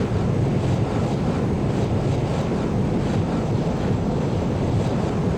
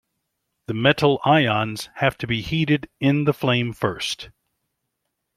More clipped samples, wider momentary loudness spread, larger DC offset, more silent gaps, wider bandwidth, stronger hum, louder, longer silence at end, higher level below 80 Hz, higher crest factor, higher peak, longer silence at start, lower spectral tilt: neither; second, 1 LU vs 11 LU; neither; neither; second, 10 kHz vs 14.5 kHz; neither; about the same, -22 LUFS vs -21 LUFS; second, 0 s vs 1.1 s; first, -34 dBFS vs -52 dBFS; second, 10 dB vs 20 dB; second, -10 dBFS vs -2 dBFS; second, 0 s vs 0.7 s; first, -8 dB/octave vs -6 dB/octave